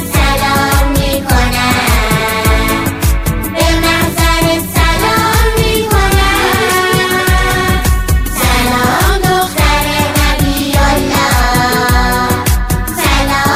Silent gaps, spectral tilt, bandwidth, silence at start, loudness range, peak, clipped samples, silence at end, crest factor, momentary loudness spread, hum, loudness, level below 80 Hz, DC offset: none; -4 dB/octave; 16 kHz; 0 s; 1 LU; 0 dBFS; under 0.1%; 0 s; 10 dB; 3 LU; none; -11 LUFS; -16 dBFS; 0.3%